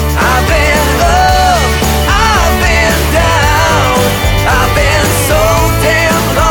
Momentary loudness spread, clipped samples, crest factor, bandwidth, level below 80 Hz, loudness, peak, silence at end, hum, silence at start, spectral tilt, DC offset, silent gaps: 2 LU; under 0.1%; 8 dB; over 20 kHz; -16 dBFS; -9 LUFS; 0 dBFS; 0 s; none; 0 s; -4 dB/octave; under 0.1%; none